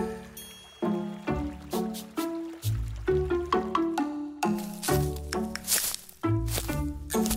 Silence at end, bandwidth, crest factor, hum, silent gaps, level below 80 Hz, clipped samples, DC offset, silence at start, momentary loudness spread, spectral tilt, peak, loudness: 0 s; 16 kHz; 20 dB; none; none; -42 dBFS; under 0.1%; under 0.1%; 0 s; 7 LU; -4.5 dB/octave; -10 dBFS; -30 LUFS